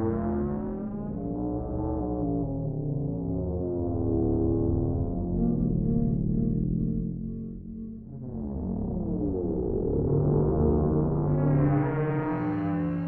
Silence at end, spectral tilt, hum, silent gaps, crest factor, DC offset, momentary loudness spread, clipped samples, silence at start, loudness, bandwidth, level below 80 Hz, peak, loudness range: 0 s; -13.5 dB/octave; none; none; 14 dB; under 0.1%; 9 LU; under 0.1%; 0 s; -28 LUFS; 3.1 kHz; -36 dBFS; -14 dBFS; 5 LU